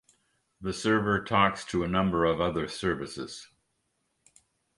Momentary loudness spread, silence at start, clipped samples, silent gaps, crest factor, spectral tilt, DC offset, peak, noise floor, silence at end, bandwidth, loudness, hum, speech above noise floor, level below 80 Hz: 14 LU; 0.6 s; under 0.1%; none; 22 dB; -5.5 dB/octave; under 0.1%; -8 dBFS; -77 dBFS; 1.3 s; 11.5 kHz; -28 LUFS; none; 49 dB; -52 dBFS